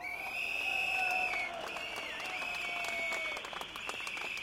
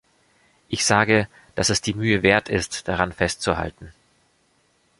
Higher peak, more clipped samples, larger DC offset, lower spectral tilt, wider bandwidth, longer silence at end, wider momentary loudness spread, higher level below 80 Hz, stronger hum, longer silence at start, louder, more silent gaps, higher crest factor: second, -22 dBFS vs -2 dBFS; neither; neither; second, -1 dB/octave vs -3.5 dB/octave; first, 16.5 kHz vs 11.5 kHz; second, 0 s vs 1.1 s; about the same, 9 LU vs 9 LU; second, -66 dBFS vs -44 dBFS; neither; second, 0 s vs 0.7 s; second, -35 LUFS vs -21 LUFS; neither; second, 16 dB vs 22 dB